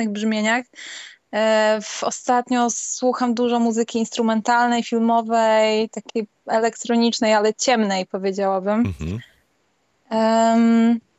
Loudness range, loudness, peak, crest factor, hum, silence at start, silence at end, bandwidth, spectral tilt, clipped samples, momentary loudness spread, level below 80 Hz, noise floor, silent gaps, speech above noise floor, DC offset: 2 LU; -20 LUFS; -6 dBFS; 14 dB; none; 0 s; 0.2 s; 8.2 kHz; -4 dB/octave; under 0.1%; 11 LU; -54 dBFS; -66 dBFS; none; 47 dB; under 0.1%